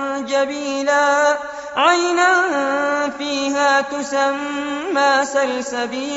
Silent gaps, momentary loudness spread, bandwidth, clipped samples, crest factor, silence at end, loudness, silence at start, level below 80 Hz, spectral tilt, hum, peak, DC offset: none; 8 LU; 8 kHz; under 0.1%; 16 dB; 0 s; -18 LUFS; 0 s; -60 dBFS; 0.5 dB/octave; none; -2 dBFS; under 0.1%